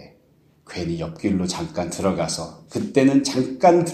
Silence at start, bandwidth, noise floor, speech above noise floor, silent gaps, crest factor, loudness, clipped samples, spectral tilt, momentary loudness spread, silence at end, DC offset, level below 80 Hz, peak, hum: 0 s; 13 kHz; -58 dBFS; 37 dB; none; 20 dB; -22 LUFS; under 0.1%; -5.5 dB/octave; 13 LU; 0 s; under 0.1%; -52 dBFS; -2 dBFS; none